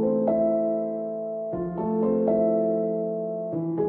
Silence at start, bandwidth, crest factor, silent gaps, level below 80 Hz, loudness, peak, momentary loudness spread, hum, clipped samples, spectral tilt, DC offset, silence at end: 0 s; 2.8 kHz; 14 dB; none; -58 dBFS; -26 LUFS; -10 dBFS; 8 LU; none; under 0.1%; -13 dB/octave; under 0.1%; 0 s